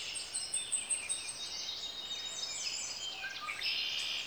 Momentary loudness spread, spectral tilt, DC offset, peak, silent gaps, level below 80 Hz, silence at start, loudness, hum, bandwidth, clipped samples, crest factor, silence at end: 6 LU; 2 dB/octave; under 0.1%; -22 dBFS; none; -72 dBFS; 0 s; -36 LUFS; none; over 20 kHz; under 0.1%; 18 dB; 0 s